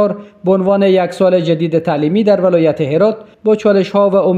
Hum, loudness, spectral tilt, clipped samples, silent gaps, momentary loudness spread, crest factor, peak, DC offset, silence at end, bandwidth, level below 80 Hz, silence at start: none; -13 LUFS; -8 dB/octave; under 0.1%; none; 4 LU; 12 dB; 0 dBFS; under 0.1%; 0 s; 9.4 kHz; -56 dBFS; 0 s